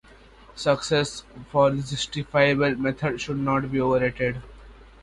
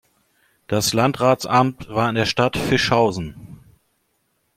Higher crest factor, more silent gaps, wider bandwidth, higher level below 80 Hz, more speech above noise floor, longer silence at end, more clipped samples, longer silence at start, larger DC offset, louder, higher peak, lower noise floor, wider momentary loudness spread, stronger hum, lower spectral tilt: about the same, 20 dB vs 18 dB; neither; second, 11.5 kHz vs 16.5 kHz; about the same, -48 dBFS vs -48 dBFS; second, 26 dB vs 50 dB; second, 0.2 s vs 1 s; neither; second, 0.55 s vs 0.7 s; neither; second, -24 LUFS vs -19 LUFS; second, -6 dBFS vs -2 dBFS; second, -50 dBFS vs -68 dBFS; about the same, 8 LU vs 6 LU; neither; about the same, -5.5 dB/octave vs -4.5 dB/octave